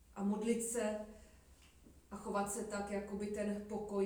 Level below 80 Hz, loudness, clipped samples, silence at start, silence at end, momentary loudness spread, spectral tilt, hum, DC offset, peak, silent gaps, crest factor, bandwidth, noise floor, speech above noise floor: -64 dBFS; -40 LUFS; under 0.1%; 0.1 s; 0 s; 13 LU; -5 dB/octave; none; under 0.1%; -24 dBFS; none; 18 dB; over 20 kHz; -63 dBFS; 24 dB